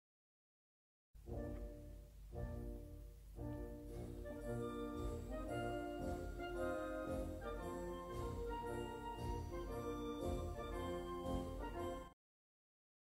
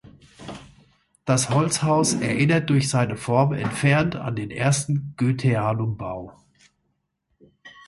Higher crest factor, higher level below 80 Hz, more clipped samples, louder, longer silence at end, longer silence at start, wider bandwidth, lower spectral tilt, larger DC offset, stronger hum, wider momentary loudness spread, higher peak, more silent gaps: about the same, 18 dB vs 18 dB; about the same, -54 dBFS vs -54 dBFS; neither; second, -47 LUFS vs -22 LUFS; first, 0.9 s vs 0.15 s; first, 1.15 s vs 0.4 s; first, 16 kHz vs 11.5 kHz; first, -7 dB/octave vs -5.5 dB/octave; neither; neither; second, 8 LU vs 17 LU; second, -30 dBFS vs -6 dBFS; neither